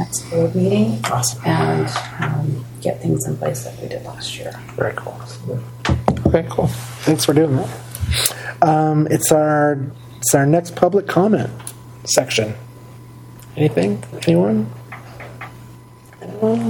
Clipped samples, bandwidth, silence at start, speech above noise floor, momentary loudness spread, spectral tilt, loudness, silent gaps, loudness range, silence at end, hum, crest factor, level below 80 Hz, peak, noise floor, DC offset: under 0.1%; 17.5 kHz; 0 s; 24 dB; 19 LU; -5 dB/octave; -18 LUFS; none; 7 LU; 0 s; none; 18 dB; -40 dBFS; 0 dBFS; -41 dBFS; under 0.1%